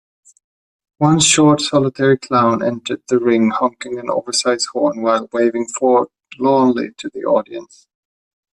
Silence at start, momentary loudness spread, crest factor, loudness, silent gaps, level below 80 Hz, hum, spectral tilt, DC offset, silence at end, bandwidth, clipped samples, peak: 1 s; 11 LU; 16 dB; -16 LUFS; none; -58 dBFS; none; -4 dB/octave; under 0.1%; 0.95 s; 11.5 kHz; under 0.1%; 0 dBFS